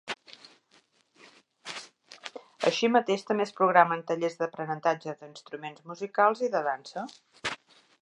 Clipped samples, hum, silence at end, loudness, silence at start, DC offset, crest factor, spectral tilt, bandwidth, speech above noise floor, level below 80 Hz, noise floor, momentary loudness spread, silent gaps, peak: under 0.1%; none; 0.45 s; -28 LUFS; 0.05 s; under 0.1%; 26 dB; -4.5 dB/octave; 11.5 kHz; 38 dB; -78 dBFS; -65 dBFS; 20 LU; none; -4 dBFS